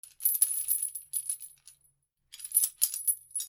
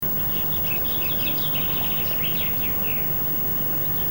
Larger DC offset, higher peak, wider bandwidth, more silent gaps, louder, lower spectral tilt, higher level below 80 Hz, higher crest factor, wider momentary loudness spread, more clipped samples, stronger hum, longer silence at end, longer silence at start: second, under 0.1% vs 0.8%; first, -8 dBFS vs -12 dBFS; about the same, over 20 kHz vs 19 kHz; neither; second, -28 LUFS vs -20 LUFS; second, 5 dB/octave vs -4.5 dB/octave; second, -80 dBFS vs -42 dBFS; first, 26 dB vs 10 dB; first, 12 LU vs 0 LU; neither; neither; about the same, 0 s vs 0 s; about the same, 0.05 s vs 0 s